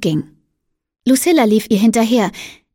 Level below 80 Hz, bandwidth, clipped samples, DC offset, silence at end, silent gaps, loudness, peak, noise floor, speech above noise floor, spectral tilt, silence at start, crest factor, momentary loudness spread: -54 dBFS; 17 kHz; under 0.1%; under 0.1%; 0.2 s; none; -15 LUFS; -2 dBFS; -72 dBFS; 58 dB; -5 dB/octave; 0 s; 14 dB; 11 LU